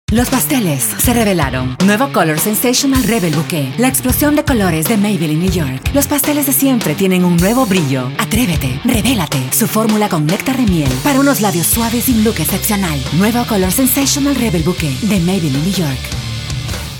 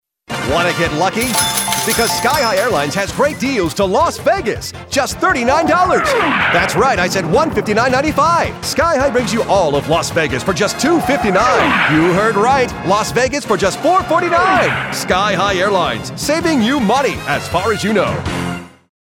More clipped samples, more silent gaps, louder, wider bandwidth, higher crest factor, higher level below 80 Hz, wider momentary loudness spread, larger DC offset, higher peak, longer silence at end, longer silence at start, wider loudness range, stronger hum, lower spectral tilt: neither; neither; about the same, -13 LUFS vs -14 LUFS; about the same, 17.5 kHz vs 18 kHz; about the same, 14 dB vs 12 dB; first, -30 dBFS vs -38 dBFS; about the same, 5 LU vs 6 LU; neither; about the same, 0 dBFS vs -2 dBFS; second, 0 s vs 0.35 s; second, 0.1 s vs 0.3 s; about the same, 1 LU vs 2 LU; neither; about the same, -4.5 dB/octave vs -4 dB/octave